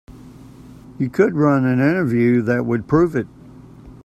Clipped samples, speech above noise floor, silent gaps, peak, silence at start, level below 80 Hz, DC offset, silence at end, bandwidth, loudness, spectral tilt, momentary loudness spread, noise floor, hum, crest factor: under 0.1%; 25 dB; none; -2 dBFS; 0.1 s; -48 dBFS; under 0.1%; 0.1 s; 12.5 kHz; -18 LUFS; -9 dB/octave; 9 LU; -41 dBFS; none; 18 dB